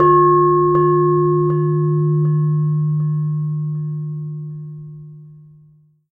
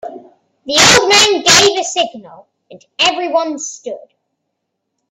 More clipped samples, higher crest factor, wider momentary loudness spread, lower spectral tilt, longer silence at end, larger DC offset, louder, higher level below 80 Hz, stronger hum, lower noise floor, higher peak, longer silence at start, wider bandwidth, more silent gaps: second, under 0.1% vs 0.1%; about the same, 14 dB vs 16 dB; second, 18 LU vs 21 LU; first, -13.5 dB/octave vs -1 dB/octave; second, 0.75 s vs 1.15 s; neither; second, -17 LUFS vs -10 LUFS; about the same, -52 dBFS vs -48 dBFS; neither; second, -51 dBFS vs -73 dBFS; about the same, -2 dBFS vs 0 dBFS; about the same, 0 s vs 0.05 s; second, 1.8 kHz vs over 20 kHz; neither